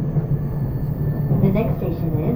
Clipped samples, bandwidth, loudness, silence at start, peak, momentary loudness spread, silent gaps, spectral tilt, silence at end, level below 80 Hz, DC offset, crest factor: under 0.1%; 16 kHz; -21 LUFS; 0 s; -4 dBFS; 6 LU; none; -11.5 dB/octave; 0 s; -32 dBFS; under 0.1%; 16 dB